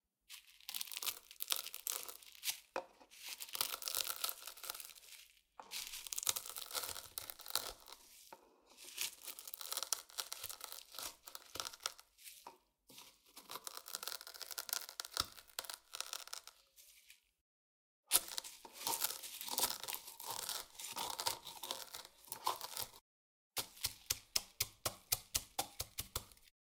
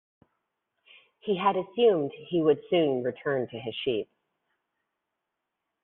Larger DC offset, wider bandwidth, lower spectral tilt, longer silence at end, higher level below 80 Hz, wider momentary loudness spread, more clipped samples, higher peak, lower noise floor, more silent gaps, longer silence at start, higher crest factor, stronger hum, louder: neither; first, 18 kHz vs 4.1 kHz; second, 0.5 dB/octave vs -4 dB/octave; second, 0.3 s vs 1.8 s; about the same, -72 dBFS vs -72 dBFS; first, 19 LU vs 10 LU; neither; first, -6 dBFS vs -10 dBFS; second, -67 dBFS vs -84 dBFS; first, 17.41-18.03 s, 23.01-23.51 s vs none; second, 0.3 s vs 1.25 s; first, 40 dB vs 20 dB; neither; second, -42 LUFS vs -27 LUFS